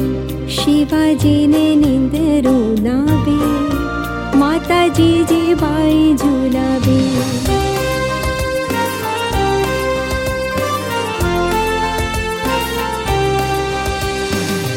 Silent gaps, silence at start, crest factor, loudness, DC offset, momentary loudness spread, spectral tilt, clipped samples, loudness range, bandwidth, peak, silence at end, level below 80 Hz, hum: none; 0 s; 12 dB; -15 LUFS; under 0.1%; 6 LU; -5.5 dB/octave; under 0.1%; 4 LU; 17 kHz; -2 dBFS; 0 s; -30 dBFS; none